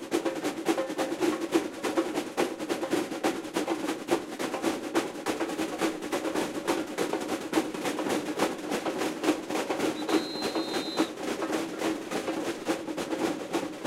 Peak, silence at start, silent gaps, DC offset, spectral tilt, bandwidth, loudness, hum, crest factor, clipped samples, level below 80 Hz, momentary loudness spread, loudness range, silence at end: -10 dBFS; 0 s; none; under 0.1%; -3.5 dB/octave; 16 kHz; -31 LUFS; none; 20 dB; under 0.1%; -68 dBFS; 3 LU; 1 LU; 0 s